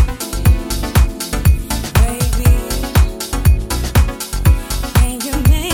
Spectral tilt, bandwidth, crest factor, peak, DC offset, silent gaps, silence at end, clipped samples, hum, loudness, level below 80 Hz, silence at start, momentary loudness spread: -5 dB/octave; 17 kHz; 14 dB; 0 dBFS; under 0.1%; none; 0 s; under 0.1%; none; -16 LUFS; -16 dBFS; 0 s; 3 LU